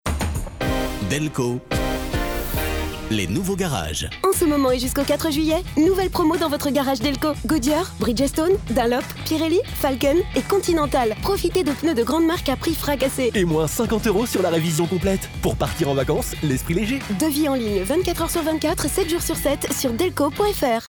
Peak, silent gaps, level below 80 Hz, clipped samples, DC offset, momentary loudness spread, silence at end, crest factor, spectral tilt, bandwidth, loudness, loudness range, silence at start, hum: -10 dBFS; none; -34 dBFS; under 0.1%; under 0.1%; 5 LU; 0 s; 12 dB; -5 dB/octave; over 20 kHz; -21 LUFS; 2 LU; 0.05 s; none